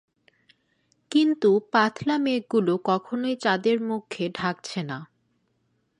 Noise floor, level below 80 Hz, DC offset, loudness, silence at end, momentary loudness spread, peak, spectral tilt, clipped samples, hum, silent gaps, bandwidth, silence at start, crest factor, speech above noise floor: -71 dBFS; -70 dBFS; under 0.1%; -24 LUFS; 0.95 s; 11 LU; -6 dBFS; -5.5 dB/octave; under 0.1%; none; none; 11 kHz; 1.1 s; 18 dB; 47 dB